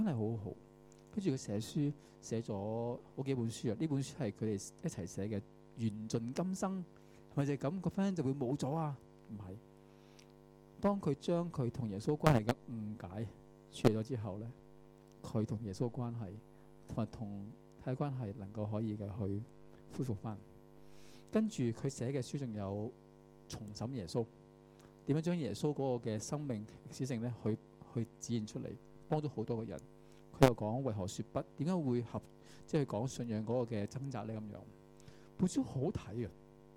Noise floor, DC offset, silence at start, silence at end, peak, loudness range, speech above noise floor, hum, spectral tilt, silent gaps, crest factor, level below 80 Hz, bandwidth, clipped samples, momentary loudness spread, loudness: -60 dBFS; under 0.1%; 0 s; 0 s; -8 dBFS; 6 LU; 23 dB; none; -7 dB/octave; none; 30 dB; -64 dBFS; 17 kHz; under 0.1%; 15 LU; -39 LUFS